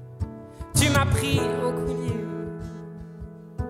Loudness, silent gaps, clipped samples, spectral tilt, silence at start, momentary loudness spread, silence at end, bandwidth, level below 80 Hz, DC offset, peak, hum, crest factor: -25 LUFS; none; under 0.1%; -4.5 dB/octave; 0 s; 20 LU; 0 s; 16.5 kHz; -42 dBFS; under 0.1%; -6 dBFS; none; 20 dB